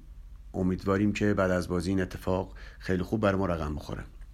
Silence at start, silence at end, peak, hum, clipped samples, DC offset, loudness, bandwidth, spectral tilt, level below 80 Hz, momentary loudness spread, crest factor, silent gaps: 0 s; 0 s; -12 dBFS; none; under 0.1%; under 0.1%; -29 LUFS; 14.5 kHz; -7 dB/octave; -44 dBFS; 13 LU; 16 dB; none